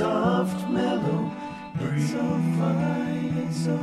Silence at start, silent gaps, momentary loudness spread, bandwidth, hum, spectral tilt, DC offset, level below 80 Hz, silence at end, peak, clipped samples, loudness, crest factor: 0 s; none; 7 LU; 12.5 kHz; none; -7.5 dB/octave; under 0.1%; -58 dBFS; 0 s; -12 dBFS; under 0.1%; -26 LUFS; 12 dB